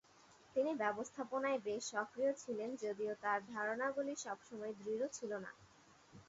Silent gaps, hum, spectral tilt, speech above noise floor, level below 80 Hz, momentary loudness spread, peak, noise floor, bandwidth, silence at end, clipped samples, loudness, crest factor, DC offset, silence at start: none; none; -3 dB/octave; 25 dB; -82 dBFS; 8 LU; -24 dBFS; -66 dBFS; 7.6 kHz; 0.05 s; under 0.1%; -41 LUFS; 18 dB; under 0.1%; 0.3 s